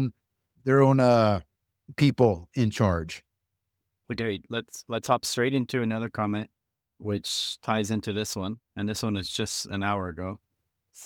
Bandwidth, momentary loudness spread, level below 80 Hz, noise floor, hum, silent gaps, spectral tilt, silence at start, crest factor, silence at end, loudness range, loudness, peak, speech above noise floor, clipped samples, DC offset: 18 kHz; 14 LU; -54 dBFS; -82 dBFS; none; none; -5.5 dB/octave; 0 s; 22 dB; 0 s; 6 LU; -27 LUFS; -6 dBFS; 56 dB; under 0.1%; under 0.1%